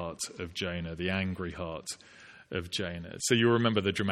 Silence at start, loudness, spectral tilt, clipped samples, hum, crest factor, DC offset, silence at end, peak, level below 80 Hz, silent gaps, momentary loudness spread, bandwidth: 0 s; -31 LUFS; -4.5 dB/octave; under 0.1%; none; 20 dB; under 0.1%; 0 s; -12 dBFS; -56 dBFS; none; 14 LU; 15.5 kHz